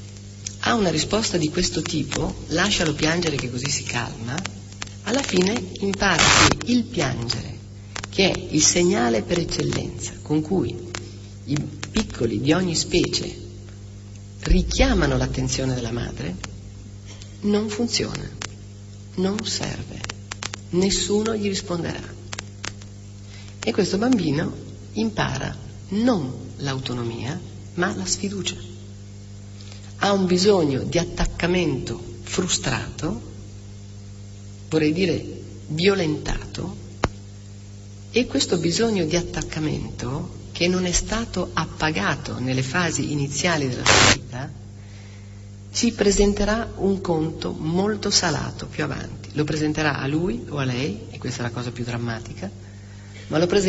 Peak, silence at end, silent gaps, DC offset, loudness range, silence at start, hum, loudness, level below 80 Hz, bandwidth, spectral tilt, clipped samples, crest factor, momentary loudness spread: -2 dBFS; 0 s; none; under 0.1%; 6 LU; 0 s; 50 Hz at -40 dBFS; -23 LUFS; -36 dBFS; 8.2 kHz; -4 dB/octave; under 0.1%; 22 dB; 20 LU